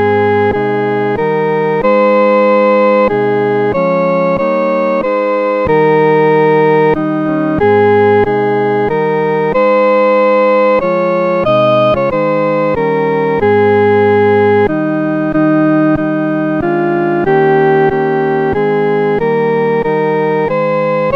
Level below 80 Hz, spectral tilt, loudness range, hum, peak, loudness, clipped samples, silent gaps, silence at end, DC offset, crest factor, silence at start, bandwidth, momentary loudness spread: -42 dBFS; -9 dB/octave; 2 LU; none; 0 dBFS; -11 LUFS; under 0.1%; none; 0 s; 0.3%; 10 dB; 0 s; 6 kHz; 4 LU